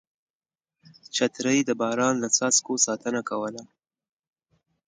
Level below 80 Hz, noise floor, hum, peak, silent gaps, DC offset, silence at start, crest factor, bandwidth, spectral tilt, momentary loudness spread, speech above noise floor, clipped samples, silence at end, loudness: -74 dBFS; under -90 dBFS; none; -6 dBFS; none; under 0.1%; 1.15 s; 22 dB; 10 kHz; -2.5 dB/octave; 11 LU; over 65 dB; under 0.1%; 1.2 s; -24 LUFS